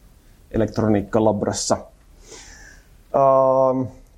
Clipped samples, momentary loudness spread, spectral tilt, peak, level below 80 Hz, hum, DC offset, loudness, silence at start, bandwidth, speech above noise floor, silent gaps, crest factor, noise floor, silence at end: under 0.1%; 11 LU; -5.5 dB/octave; -4 dBFS; -46 dBFS; none; under 0.1%; -20 LUFS; 0.5 s; 13 kHz; 31 dB; none; 18 dB; -50 dBFS; 0.25 s